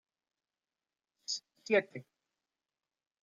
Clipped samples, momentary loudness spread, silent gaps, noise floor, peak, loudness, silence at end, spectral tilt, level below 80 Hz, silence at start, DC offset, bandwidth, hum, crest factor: under 0.1%; 17 LU; none; under -90 dBFS; -16 dBFS; -34 LUFS; 1.2 s; -3 dB/octave; under -90 dBFS; 1.3 s; under 0.1%; 9.4 kHz; none; 24 dB